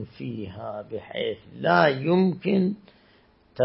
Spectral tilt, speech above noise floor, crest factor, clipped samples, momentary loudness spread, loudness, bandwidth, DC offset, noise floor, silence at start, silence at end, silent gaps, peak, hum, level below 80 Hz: -11 dB/octave; 34 dB; 22 dB; under 0.1%; 15 LU; -25 LUFS; 5.8 kHz; under 0.1%; -59 dBFS; 0 s; 0 s; none; -4 dBFS; none; -64 dBFS